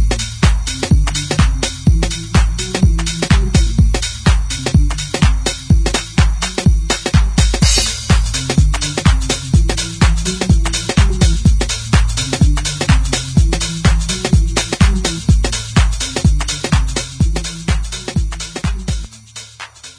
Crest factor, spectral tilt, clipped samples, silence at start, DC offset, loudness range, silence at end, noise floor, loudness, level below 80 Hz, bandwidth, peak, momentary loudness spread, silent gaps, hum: 14 dB; -4.5 dB/octave; under 0.1%; 0 s; under 0.1%; 2 LU; 0.05 s; -35 dBFS; -15 LUFS; -16 dBFS; 11 kHz; 0 dBFS; 7 LU; none; none